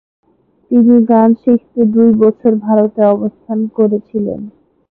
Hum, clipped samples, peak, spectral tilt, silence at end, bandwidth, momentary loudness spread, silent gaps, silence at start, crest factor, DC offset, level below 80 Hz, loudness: none; under 0.1%; 0 dBFS; -13 dB/octave; 0.45 s; 2.6 kHz; 11 LU; none; 0.7 s; 12 dB; under 0.1%; -54 dBFS; -12 LUFS